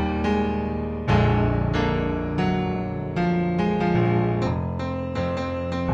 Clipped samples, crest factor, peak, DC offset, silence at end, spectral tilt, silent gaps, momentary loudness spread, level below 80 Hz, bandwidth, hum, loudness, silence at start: under 0.1%; 16 dB; -8 dBFS; under 0.1%; 0 s; -8.5 dB/octave; none; 7 LU; -36 dBFS; 7.6 kHz; none; -24 LUFS; 0 s